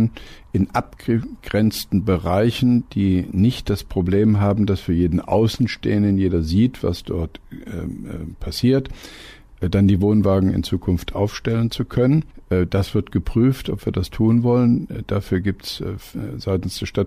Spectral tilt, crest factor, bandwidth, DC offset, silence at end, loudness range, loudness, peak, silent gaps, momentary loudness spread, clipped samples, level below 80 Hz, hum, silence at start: -7.5 dB/octave; 14 dB; 15.5 kHz; under 0.1%; 0 s; 3 LU; -20 LUFS; -6 dBFS; none; 13 LU; under 0.1%; -36 dBFS; none; 0 s